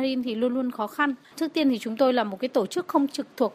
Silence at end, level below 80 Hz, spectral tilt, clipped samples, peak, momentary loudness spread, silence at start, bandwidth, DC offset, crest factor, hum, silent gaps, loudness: 0 s; -72 dBFS; -4.5 dB/octave; under 0.1%; -8 dBFS; 6 LU; 0 s; 15.5 kHz; under 0.1%; 16 dB; none; none; -26 LUFS